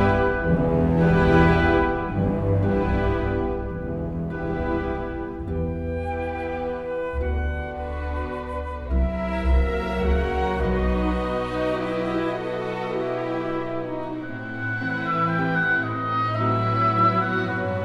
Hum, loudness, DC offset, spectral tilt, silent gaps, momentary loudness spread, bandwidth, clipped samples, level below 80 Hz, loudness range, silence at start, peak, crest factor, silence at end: none; -24 LUFS; under 0.1%; -8.5 dB/octave; none; 10 LU; 7.6 kHz; under 0.1%; -30 dBFS; 7 LU; 0 s; -4 dBFS; 18 dB; 0 s